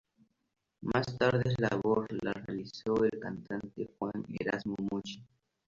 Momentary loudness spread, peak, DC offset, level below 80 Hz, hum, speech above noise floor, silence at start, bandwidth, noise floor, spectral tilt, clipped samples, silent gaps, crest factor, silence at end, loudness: 12 LU; -14 dBFS; under 0.1%; -62 dBFS; none; 38 dB; 0.8 s; 7.6 kHz; -71 dBFS; -7 dB/octave; under 0.1%; none; 22 dB; 0.45 s; -34 LUFS